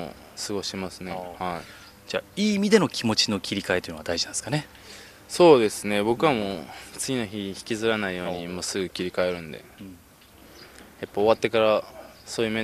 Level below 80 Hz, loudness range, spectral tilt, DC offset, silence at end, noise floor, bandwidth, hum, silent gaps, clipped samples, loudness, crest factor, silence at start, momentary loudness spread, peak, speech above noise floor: -58 dBFS; 6 LU; -4 dB/octave; under 0.1%; 0 s; -51 dBFS; 15 kHz; none; none; under 0.1%; -25 LUFS; 22 dB; 0 s; 21 LU; -2 dBFS; 26 dB